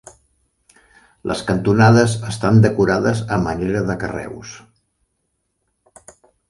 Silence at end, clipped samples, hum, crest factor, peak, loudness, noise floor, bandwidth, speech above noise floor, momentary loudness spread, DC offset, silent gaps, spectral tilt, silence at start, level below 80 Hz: 1.95 s; under 0.1%; none; 18 dB; 0 dBFS; -17 LUFS; -71 dBFS; 11.5 kHz; 55 dB; 18 LU; under 0.1%; none; -6.5 dB/octave; 1.25 s; -44 dBFS